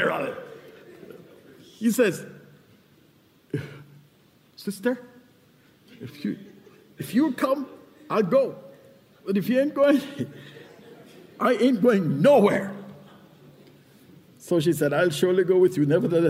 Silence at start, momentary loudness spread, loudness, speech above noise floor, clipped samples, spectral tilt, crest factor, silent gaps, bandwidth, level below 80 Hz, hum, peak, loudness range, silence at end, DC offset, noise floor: 0 s; 23 LU; -23 LUFS; 37 dB; under 0.1%; -6.5 dB/octave; 18 dB; none; 16 kHz; -70 dBFS; none; -6 dBFS; 12 LU; 0 s; under 0.1%; -59 dBFS